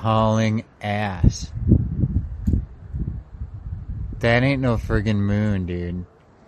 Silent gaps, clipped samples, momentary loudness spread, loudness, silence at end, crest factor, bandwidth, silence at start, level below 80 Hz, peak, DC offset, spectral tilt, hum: none; under 0.1%; 15 LU; -22 LUFS; 0.45 s; 20 dB; 8.6 kHz; 0 s; -30 dBFS; -2 dBFS; under 0.1%; -7 dB/octave; none